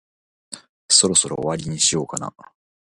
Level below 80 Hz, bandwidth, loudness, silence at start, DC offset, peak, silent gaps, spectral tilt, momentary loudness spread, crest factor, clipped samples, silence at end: -54 dBFS; 11.5 kHz; -18 LUFS; 0.5 s; under 0.1%; 0 dBFS; 0.69-0.89 s; -2 dB/octave; 24 LU; 22 dB; under 0.1%; 0.45 s